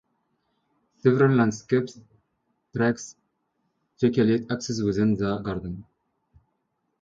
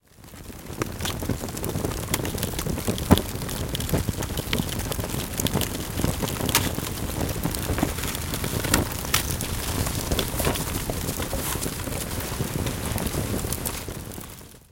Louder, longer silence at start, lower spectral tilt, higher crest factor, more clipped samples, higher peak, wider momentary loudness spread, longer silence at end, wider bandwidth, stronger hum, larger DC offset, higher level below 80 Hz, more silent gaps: first, -24 LUFS vs -27 LUFS; first, 1.05 s vs 0.2 s; first, -7 dB/octave vs -4 dB/octave; second, 20 dB vs 26 dB; neither; second, -6 dBFS vs 0 dBFS; first, 16 LU vs 7 LU; first, 1.2 s vs 0.1 s; second, 7.8 kHz vs 17 kHz; neither; neither; second, -56 dBFS vs -36 dBFS; neither